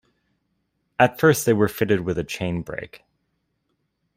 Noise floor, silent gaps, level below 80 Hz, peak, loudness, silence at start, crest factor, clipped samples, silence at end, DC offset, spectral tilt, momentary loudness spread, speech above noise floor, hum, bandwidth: -73 dBFS; none; -54 dBFS; -2 dBFS; -21 LUFS; 1 s; 22 dB; under 0.1%; 1.2 s; under 0.1%; -5.5 dB/octave; 17 LU; 52 dB; none; 16 kHz